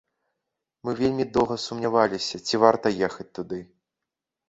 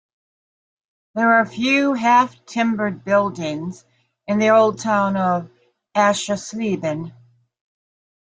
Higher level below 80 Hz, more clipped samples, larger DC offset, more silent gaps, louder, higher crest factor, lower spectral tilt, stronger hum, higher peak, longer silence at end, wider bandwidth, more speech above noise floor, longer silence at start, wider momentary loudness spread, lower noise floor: first, -56 dBFS vs -64 dBFS; neither; neither; neither; second, -24 LUFS vs -19 LUFS; first, 24 dB vs 18 dB; about the same, -5 dB/octave vs -5 dB/octave; neither; about the same, -2 dBFS vs -2 dBFS; second, 0.85 s vs 1.3 s; second, 8.2 kHz vs 9.4 kHz; second, 62 dB vs over 71 dB; second, 0.85 s vs 1.15 s; first, 15 LU vs 12 LU; second, -86 dBFS vs under -90 dBFS